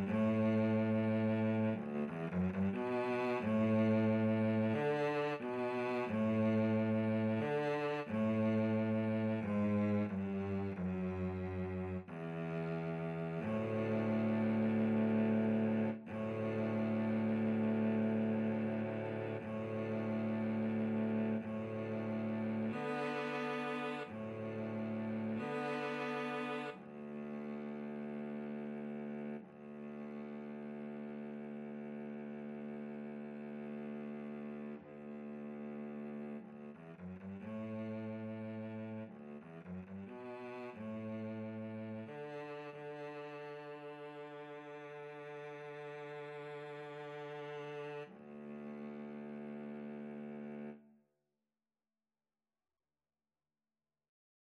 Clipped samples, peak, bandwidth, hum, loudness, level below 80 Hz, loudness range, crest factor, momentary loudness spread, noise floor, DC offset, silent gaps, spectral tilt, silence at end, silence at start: under 0.1%; -24 dBFS; 6.4 kHz; none; -39 LUFS; -76 dBFS; 13 LU; 16 dB; 15 LU; under -90 dBFS; under 0.1%; none; -8.5 dB/octave; 3.6 s; 0 s